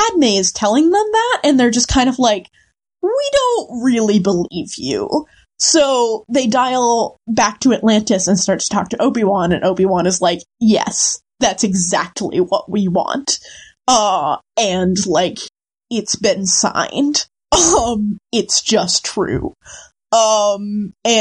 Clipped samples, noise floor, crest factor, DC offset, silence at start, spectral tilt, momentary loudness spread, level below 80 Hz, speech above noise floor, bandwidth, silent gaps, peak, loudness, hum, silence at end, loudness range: under 0.1%; -56 dBFS; 16 dB; under 0.1%; 0 s; -3.5 dB/octave; 8 LU; -42 dBFS; 41 dB; 11.5 kHz; none; 0 dBFS; -15 LUFS; none; 0 s; 2 LU